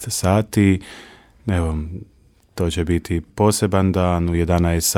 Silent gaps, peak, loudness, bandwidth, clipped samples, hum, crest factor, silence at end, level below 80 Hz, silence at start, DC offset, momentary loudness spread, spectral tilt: none; -2 dBFS; -19 LUFS; 17 kHz; under 0.1%; none; 18 dB; 0 s; -34 dBFS; 0 s; under 0.1%; 15 LU; -5.5 dB/octave